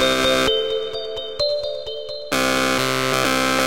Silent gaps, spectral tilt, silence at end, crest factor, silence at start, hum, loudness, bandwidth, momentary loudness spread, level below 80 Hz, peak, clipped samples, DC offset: none; -2.5 dB/octave; 0 s; 20 dB; 0 s; none; -20 LUFS; 17 kHz; 11 LU; -46 dBFS; -2 dBFS; under 0.1%; 1%